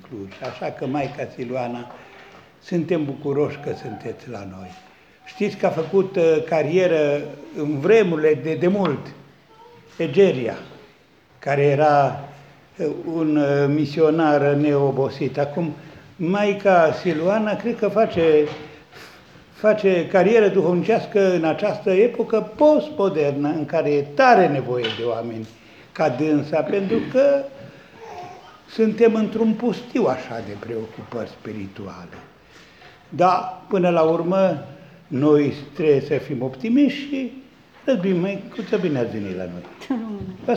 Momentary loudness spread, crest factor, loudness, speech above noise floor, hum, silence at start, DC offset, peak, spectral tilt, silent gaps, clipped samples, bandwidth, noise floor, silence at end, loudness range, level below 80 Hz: 17 LU; 18 dB; -20 LUFS; 34 dB; none; 0.1 s; under 0.1%; -2 dBFS; -7.5 dB/octave; none; under 0.1%; 8 kHz; -54 dBFS; 0 s; 8 LU; -62 dBFS